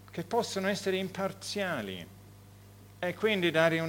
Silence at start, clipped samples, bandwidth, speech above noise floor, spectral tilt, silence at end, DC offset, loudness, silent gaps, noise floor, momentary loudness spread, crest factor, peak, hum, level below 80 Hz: 0 s; under 0.1%; 19 kHz; 22 dB; -4.5 dB/octave; 0 s; under 0.1%; -31 LUFS; none; -53 dBFS; 12 LU; 22 dB; -10 dBFS; 50 Hz at -55 dBFS; -66 dBFS